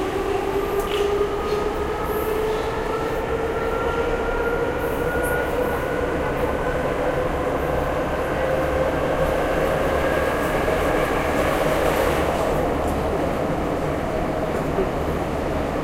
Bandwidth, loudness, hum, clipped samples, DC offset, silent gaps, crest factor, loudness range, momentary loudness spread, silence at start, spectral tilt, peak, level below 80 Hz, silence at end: 16 kHz; -23 LUFS; none; under 0.1%; under 0.1%; none; 16 dB; 3 LU; 3 LU; 0 s; -6 dB/octave; -6 dBFS; -32 dBFS; 0 s